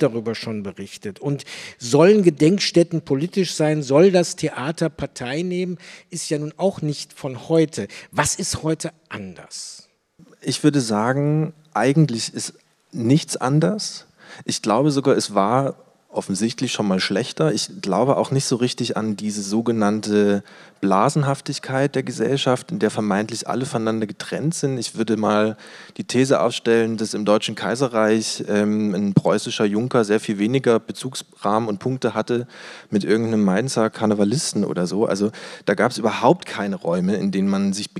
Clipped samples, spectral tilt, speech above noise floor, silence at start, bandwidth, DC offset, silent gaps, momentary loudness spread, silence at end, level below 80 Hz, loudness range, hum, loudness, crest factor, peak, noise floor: under 0.1%; -5.5 dB/octave; 32 dB; 0 s; 14 kHz; under 0.1%; none; 12 LU; 0 s; -62 dBFS; 4 LU; none; -21 LUFS; 20 dB; -2 dBFS; -52 dBFS